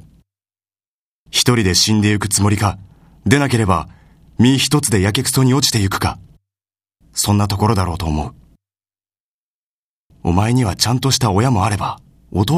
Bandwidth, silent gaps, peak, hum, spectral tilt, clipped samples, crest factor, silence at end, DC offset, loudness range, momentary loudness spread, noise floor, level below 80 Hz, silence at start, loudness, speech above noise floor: 15.5 kHz; 9.20-10.10 s; 0 dBFS; none; -4.5 dB/octave; under 0.1%; 18 dB; 0 s; under 0.1%; 5 LU; 12 LU; under -90 dBFS; -38 dBFS; 1.35 s; -16 LUFS; over 75 dB